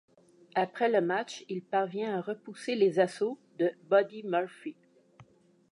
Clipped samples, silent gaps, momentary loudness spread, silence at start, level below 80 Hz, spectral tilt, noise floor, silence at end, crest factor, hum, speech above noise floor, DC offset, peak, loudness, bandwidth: under 0.1%; none; 12 LU; 0.55 s; -84 dBFS; -5.5 dB/octave; -62 dBFS; 0.5 s; 20 dB; none; 32 dB; under 0.1%; -12 dBFS; -31 LUFS; 11 kHz